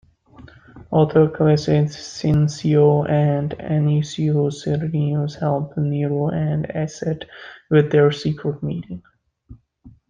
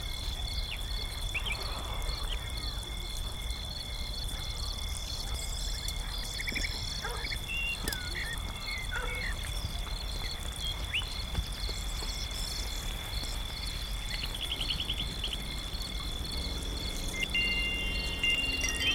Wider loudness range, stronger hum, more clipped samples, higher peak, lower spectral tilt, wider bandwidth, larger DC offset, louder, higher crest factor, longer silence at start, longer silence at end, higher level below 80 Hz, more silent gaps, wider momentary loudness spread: about the same, 4 LU vs 4 LU; neither; neither; first, -2 dBFS vs -16 dBFS; first, -7.5 dB/octave vs -2.5 dB/octave; second, 7.4 kHz vs 17.5 kHz; neither; first, -20 LUFS vs -34 LUFS; about the same, 18 dB vs 20 dB; first, 0.4 s vs 0 s; first, 0.2 s vs 0 s; second, -50 dBFS vs -38 dBFS; neither; first, 11 LU vs 7 LU